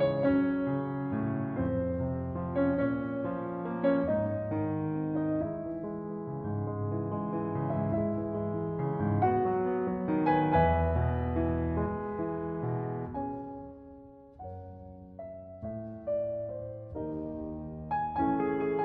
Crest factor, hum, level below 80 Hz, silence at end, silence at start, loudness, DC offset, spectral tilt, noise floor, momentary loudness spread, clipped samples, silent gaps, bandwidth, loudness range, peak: 18 dB; none; -48 dBFS; 0 s; 0 s; -32 LUFS; under 0.1%; -8.5 dB/octave; -51 dBFS; 15 LU; under 0.1%; none; 4.5 kHz; 10 LU; -14 dBFS